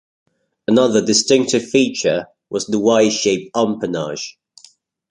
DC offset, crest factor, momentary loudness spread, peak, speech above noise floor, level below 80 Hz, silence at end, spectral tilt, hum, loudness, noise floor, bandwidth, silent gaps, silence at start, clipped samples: under 0.1%; 18 dB; 12 LU; 0 dBFS; 34 dB; -58 dBFS; 0.8 s; -3.5 dB/octave; none; -17 LUFS; -51 dBFS; 11 kHz; none; 0.7 s; under 0.1%